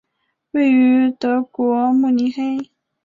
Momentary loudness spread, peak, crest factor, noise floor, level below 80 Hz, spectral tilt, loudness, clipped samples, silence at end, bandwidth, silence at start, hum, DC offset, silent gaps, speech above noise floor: 11 LU; -6 dBFS; 10 dB; -72 dBFS; -66 dBFS; -6.5 dB/octave; -17 LUFS; under 0.1%; 0.4 s; 6 kHz; 0.55 s; none; under 0.1%; none; 56 dB